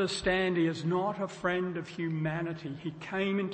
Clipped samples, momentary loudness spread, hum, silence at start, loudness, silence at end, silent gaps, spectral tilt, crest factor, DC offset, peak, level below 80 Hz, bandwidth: under 0.1%; 9 LU; none; 0 s; -32 LUFS; 0 s; none; -6 dB/octave; 16 dB; under 0.1%; -16 dBFS; -58 dBFS; 8.8 kHz